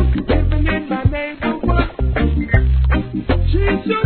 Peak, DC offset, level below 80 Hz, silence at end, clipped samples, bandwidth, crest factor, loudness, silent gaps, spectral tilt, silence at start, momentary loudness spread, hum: 0 dBFS; 0.2%; -18 dBFS; 0 s; under 0.1%; 4.5 kHz; 16 dB; -18 LUFS; none; -11 dB/octave; 0 s; 4 LU; none